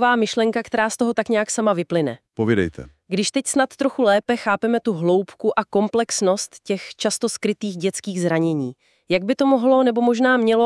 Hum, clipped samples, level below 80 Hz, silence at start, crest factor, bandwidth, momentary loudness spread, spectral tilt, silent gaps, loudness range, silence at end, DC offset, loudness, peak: none; under 0.1%; -60 dBFS; 0 s; 16 dB; 12 kHz; 8 LU; -4.5 dB/octave; none; 2 LU; 0 s; under 0.1%; -20 LUFS; -4 dBFS